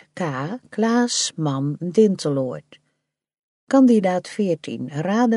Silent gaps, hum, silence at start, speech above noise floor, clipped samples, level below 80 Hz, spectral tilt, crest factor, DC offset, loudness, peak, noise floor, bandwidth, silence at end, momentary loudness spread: 3.39-3.67 s; none; 0.15 s; 54 dB; under 0.1%; -70 dBFS; -5 dB/octave; 16 dB; under 0.1%; -21 LUFS; -4 dBFS; -74 dBFS; 11.5 kHz; 0 s; 13 LU